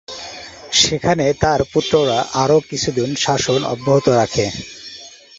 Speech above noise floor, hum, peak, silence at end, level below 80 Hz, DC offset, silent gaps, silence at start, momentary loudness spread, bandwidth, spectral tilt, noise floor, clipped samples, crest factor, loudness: 22 dB; none; 0 dBFS; 0.25 s; -42 dBFS; under 0.1%; none; 0.1 s; 17 LU; 8 kHz; -4 dB/octave; -39 dBFS; under 0.1%; 18 dB; -16 LUFS